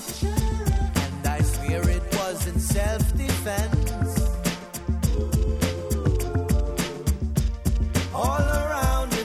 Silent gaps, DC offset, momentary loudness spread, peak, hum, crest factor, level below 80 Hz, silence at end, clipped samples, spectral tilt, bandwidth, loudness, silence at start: none; under 0.1%; 3 LU; -8 dBFS; none; 16 dB; -26 dBFS; 0 s; under 0.1%; -5.5 dB/octave; 16 kHz; -25 LUFS; 0 s